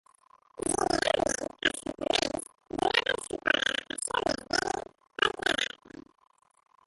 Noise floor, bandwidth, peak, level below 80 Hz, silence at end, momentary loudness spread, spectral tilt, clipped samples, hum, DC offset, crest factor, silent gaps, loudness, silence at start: -62 dBFS; 12 kHz; -8 dBFS; -58 dBFS; 1.2 s; 8 LU; -1.5 dB/octave; under 0.1%; none; under 0.1%; 22 dB; none; -29 LUFS; 0.65 s